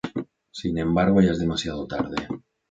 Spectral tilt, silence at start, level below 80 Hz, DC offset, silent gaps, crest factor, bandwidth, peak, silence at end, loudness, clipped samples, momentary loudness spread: -6.5 dB/octave; 0.05 s; -44 dBFS; under 0.1%; none; 18 dB; 7.8 kHz; -6 dBFS; 0.3 s; -24 LUFS; under 0.1%; 16 LU